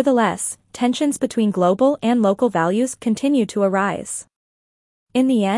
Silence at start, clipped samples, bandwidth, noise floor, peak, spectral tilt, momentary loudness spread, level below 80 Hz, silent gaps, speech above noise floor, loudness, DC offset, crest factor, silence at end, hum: 0 s; under 0.1%; 12 kHz; under -90 dBFS; -4 dBFS; -5 dB/octave; 8 LU; -64 dBFS; 4.36-5.07 s; over 72 dB; -19 LUFS; under 0.1%; 14 dB; 0 s; none